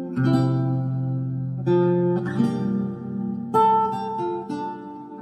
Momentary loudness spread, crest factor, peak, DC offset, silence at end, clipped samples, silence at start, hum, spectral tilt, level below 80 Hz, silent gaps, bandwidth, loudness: 10 LU; 16 dB; -8 dBFS; under 0.1%; 0 s; under 0.1%; 0 s; none; -9.5 dB/octave; -60 dBFS; none; 8.8 kHz; -23 LUFS